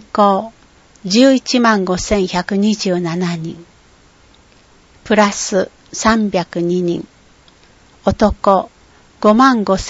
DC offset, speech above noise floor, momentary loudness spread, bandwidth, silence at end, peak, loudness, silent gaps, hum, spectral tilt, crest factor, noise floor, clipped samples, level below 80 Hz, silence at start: under 0.1%; 34 dB; 10 LU; 8 kHz; 0 s; 0 dBFS; -15 LUFS; none; none; -5 dB/octave; 16 dB; -48 dBFS; under 0.1%; -38 dBFS; 0.15 s